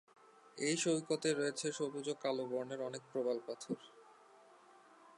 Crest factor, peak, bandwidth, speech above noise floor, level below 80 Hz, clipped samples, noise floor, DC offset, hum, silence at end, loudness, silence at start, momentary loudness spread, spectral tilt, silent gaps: 18 dB; -22 dBFS; 11.5 kHz; 25 dB; under -90 dBFS; under 0.1%; -63 dBFS; under 0.1%; none; 0.05 s; -39 LUFS; 0.55 s; 10 LU; -3.5 dB/octave; none